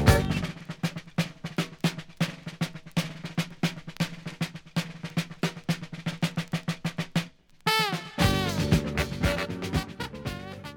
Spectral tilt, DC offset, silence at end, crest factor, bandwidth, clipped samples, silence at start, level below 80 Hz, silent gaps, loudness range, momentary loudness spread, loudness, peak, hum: -5 dB/octave; under 0.1%; 0 s; 26 dB; over 20 kHz; under 0.1%; 0 s; -42 dBFS; none; 5 LU; 10 LU; -30 LUFS; -4 dBFS; none